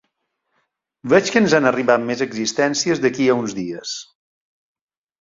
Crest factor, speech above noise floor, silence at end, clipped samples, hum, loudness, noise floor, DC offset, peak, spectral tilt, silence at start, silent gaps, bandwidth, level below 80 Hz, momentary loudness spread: 18 dB; 55 dB; 1.2 s; under 0.1%; none; -18 LUFS; -73 dBFS; under 0.1%; -2 dBFS; -4 dB/octave; 1.05 s; none; 7.8 kHz; -60 dBFS; 13 LU